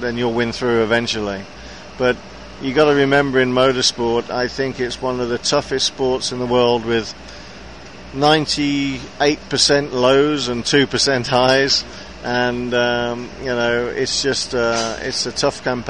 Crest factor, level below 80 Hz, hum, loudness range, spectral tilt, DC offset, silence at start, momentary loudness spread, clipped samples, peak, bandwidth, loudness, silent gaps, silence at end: 16 dB; -44 dBFS; none; 4 LU; -3.5 dB/octave; 0.6%; 0 s; 14 LU; under 0.1%; -2 dBFS; 10.5 kHz; -17 LUFS; none; 0 s